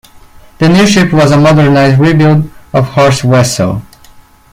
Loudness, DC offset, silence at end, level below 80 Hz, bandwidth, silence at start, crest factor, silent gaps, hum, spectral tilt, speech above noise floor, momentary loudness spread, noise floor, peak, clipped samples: -8 LUFS; under 0.1%; 0.7 s; -36 dBFS; 15.5 kHz; 0.6 s; 8 dB; none; none; -6 dB/octave; 31 dB; 8 LU; -38 dBFS; 0 dBFS; under 0.1%